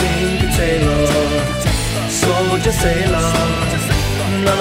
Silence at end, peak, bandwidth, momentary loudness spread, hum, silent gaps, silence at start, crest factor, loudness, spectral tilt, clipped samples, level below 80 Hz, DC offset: 0 s; -2 dBFS; 16.5 kHz; 3 LU; none; none; 0 s; 14 dB; -16 LUFS; -4.5 dB/octave; under 0.1%; -24 dBFS; under 0.1%